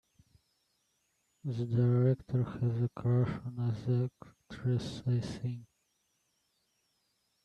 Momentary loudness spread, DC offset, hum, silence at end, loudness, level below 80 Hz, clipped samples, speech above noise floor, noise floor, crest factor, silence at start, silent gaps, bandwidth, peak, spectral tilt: 11 LU; under 0.1%; none; 1.8 s; -33 LUFS; -64 dBFS; under 0.1%; 46 dB; -78 dBFS; 16 dB; 1.45 s; none; 8.4 kHz; -18 dBFS; -8.5 dB/octave